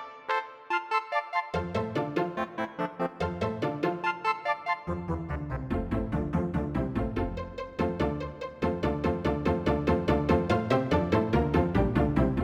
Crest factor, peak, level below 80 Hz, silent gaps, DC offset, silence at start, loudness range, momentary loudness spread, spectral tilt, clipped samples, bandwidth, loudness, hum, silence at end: 18 dB; -10 dBFS; -40 dBFS; none; under 0.1%; 0 s; 5 LU; 8 LU; -8 dB/octave; under 0.1%; 12 kHz; -29 LUFS; none; 0 s